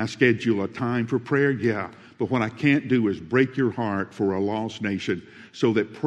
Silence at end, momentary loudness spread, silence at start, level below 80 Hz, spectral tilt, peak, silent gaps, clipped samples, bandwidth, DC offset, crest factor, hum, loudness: 0 s; 8 LU; 0 s; -64 dBFS; -7 dB/octave; -4 dBFS; none; under 0.1%; 9.6 kHz; under 0.1%; 18 dB; none; -24 LUFS